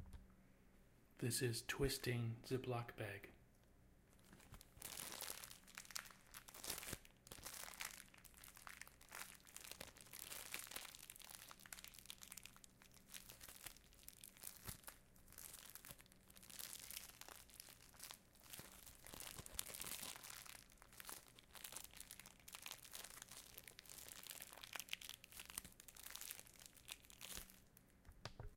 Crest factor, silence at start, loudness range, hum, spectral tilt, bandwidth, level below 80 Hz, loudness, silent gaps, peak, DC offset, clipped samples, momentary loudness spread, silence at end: 34 dB; 0 s; 10 LU; none; -3 dB/octave; 17 kHz; -68 dBFS; -52 LUFS; none; -20 dBFS; under 0.1%; under 0.1%; 15 LU; 0 s